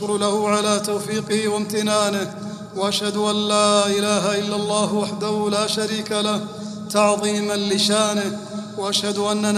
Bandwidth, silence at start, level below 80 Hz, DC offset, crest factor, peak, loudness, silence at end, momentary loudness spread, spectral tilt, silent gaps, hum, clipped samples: 14.5 kHz; 0 s; -64 dBFS; under 0.1%; 18 dB; -2 dBFS; -20 LUFS; 0 s; 9 LU; -3.5 dB/octave; none; none; under 0.1%